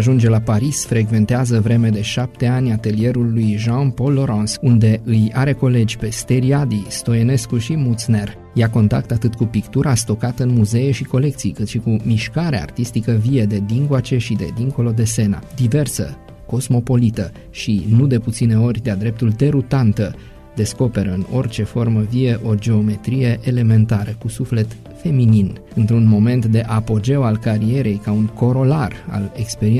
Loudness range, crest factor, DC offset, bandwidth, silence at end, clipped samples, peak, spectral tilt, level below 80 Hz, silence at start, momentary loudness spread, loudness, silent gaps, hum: 2 LU; 12 dB; under 0.1%; 13.5 kHz; 0 s; under 0.1%; -4 dBFS; -7 dB/octave; -40 dBFS; 0 s; 7 LU; -17 LUFS; none; none